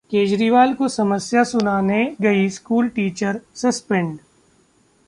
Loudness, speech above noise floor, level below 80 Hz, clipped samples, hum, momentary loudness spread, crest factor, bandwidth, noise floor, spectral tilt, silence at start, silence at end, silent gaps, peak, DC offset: -19 LUFS; 40 dB; -58 dBFS; under 0.1%; none; 7 LU; 16 dB; 11.5 kHz; -58 dBFS; -5.5 dB/octave; 0.1 s; 0.9 s; none; -4 dBFS; under 0.1%